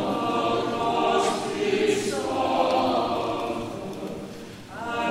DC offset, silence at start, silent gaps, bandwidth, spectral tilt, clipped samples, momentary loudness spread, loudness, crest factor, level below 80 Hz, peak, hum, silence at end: under 0.1%; 0 s; none; 16 kHz; -4.5 dB/octave; under 0.1%; 13 LU; -25 LUFS; 16 dB; -56 dBFS; -10 dBFS; none; 0 s